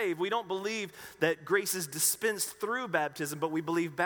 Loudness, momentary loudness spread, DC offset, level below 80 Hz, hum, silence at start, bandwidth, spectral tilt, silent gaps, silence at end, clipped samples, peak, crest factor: -31 LUFS; 7 LU; under 0.1%; -74 dBFS; none; 0 s; over 20 kHz; -3 dB/octave; none; 0 s; under 0.1%; -12 dBFS; 20 dB